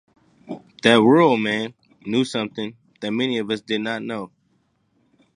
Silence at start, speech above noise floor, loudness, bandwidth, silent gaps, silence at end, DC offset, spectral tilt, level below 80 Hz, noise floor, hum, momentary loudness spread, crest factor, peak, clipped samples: 0.5 s; 46 dB; -20 LUFS; 10.5 kHz; none; 1.1 s; under 0.1%; -5.5 dB/octave; -68 dBFS; -66 dBFS; none; 23 LU; 22 dB; 0 dBFS; under 0.1%